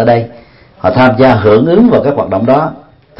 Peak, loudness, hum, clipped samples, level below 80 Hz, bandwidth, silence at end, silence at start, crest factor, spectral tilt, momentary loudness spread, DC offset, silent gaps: 0 dBFS; -9 LUFS; none; 0.4%; -40 dBFS; 5.8 kHz; 0.4 s; 0 s; 10 dB; -9.5 dB/octave; 8 LU; under 0.1%; none